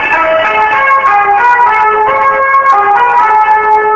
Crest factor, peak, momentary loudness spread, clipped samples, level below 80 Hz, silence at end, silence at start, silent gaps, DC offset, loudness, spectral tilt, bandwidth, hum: 8 dB; 0 dBFS; 2 LU; under 0.1%; -44 dBFS; 0 s; 0 s; none; under 0.1%; -7 LUFS; -3.5 dB/octave; 8 kHz; none